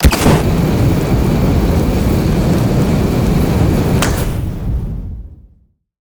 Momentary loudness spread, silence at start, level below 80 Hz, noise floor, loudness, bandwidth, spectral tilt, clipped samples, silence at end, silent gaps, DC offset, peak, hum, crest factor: 9 LU; 0 s; -20 dBFS; -52 dBFS; -14 LUFS; over 20 kHz; -6.5 dB/octave; under 0.1%; 0.75 s; none; under 0.1%; -2 dBFS; none; 12 dB